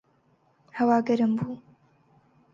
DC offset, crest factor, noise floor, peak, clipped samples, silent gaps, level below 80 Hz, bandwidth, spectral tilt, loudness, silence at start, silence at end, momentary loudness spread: under 0.1%; 18 dB; -65 dBFS; -10 dBFS; under 0.1%; none; -72 dBFS; 7.2 kHz; -8 dB/octave; -25 LUFS; 0.75 s; 0.95 s; 19 LU